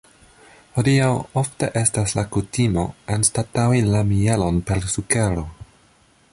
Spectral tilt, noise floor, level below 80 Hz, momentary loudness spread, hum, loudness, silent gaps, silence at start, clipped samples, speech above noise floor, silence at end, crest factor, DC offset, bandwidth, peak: -5 dB/octave; -56 dBFS; -38 dBFS; 7 LU; none; -20 LUFS; none; 0.75 s; under 0.1%; 36 dB; 0.7 s; 18 dB; under 0.1%; 11.5 kHz; -2 dBFS